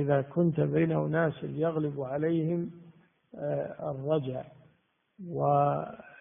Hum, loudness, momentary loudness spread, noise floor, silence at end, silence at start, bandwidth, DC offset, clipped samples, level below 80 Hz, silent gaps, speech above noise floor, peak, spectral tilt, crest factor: none; -30 LUFS; 13 LU; -70 dBFS; 0.05 s; 0 s; 3.7 kHz; under 0.1%; under 0.1%; -68 dBFS; none; 41 dB; -14 dBFS; -5.5 dB/octave; 16 dB